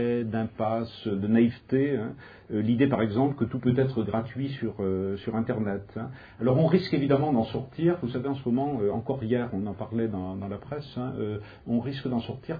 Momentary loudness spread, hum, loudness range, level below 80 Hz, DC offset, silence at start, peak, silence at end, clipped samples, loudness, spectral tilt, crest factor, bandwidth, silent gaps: 10 LU; none; 4 LU; -58 dBFS; under 0.1%; 0 s; -8 dBFS; 0 s; under 0.1%; -28 LUFS; -10.5 dB/octave; 18 dB; 5 kHz; none